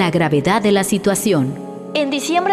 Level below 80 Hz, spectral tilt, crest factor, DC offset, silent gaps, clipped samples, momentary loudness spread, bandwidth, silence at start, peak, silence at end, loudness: -50 dBFS; -5 dB/octave; 12 dB; under 0.1%; none; under 0.1%; 8 LU; 15 kHz; 0 s; -6 dBFS; 0 s; -17 LUFS